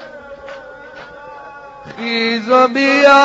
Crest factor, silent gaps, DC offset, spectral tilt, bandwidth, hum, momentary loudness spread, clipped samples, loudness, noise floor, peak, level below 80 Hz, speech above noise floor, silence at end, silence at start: 16 dB; none; under 0.1%; -0.5 dB/octave; 8 kHz; none; 24 LU; under 0.1%; -13 LUFS; -35 dBFS; 0 dBFS; -56 dBFS; 23 dB; 0 s; 0 s